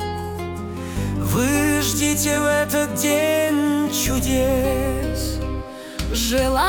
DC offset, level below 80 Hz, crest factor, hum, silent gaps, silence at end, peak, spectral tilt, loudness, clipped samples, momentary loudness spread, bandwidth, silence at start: under 0.1%; -32 dBFS; 16 dB; none; none; 0 s; -6 dBFS; -4 dB/octave; -21 LUFS; under 0.1%; 11 LU; over 20 kHz; 0 s